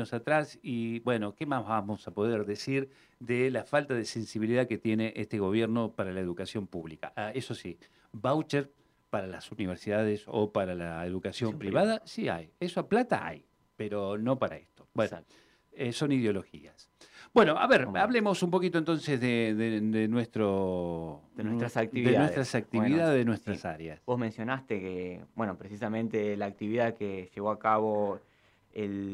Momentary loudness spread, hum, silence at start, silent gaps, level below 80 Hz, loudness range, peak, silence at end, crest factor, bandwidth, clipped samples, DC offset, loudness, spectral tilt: 12 LU; none; 0 s; none; -66 dBFS; 6 LU; -12 dBFS; 0 s; 18 dB; 12.5 kHz; under 0.1%; under 0.1%; -31 LUFS; -6.5 dB/octave